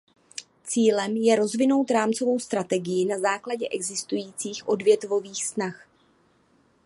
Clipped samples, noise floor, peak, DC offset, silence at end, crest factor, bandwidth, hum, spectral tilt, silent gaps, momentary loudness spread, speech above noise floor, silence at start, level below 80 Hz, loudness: under 0.1%; -63 dBFS; -8 dBFS; under 0.1%; 1.1 s; 18 dB; 11.5 kHz; none; -4 dB/octave; none; 10 LU; 39 dB; 0.4 s; -76 dBFS; -25 LUFS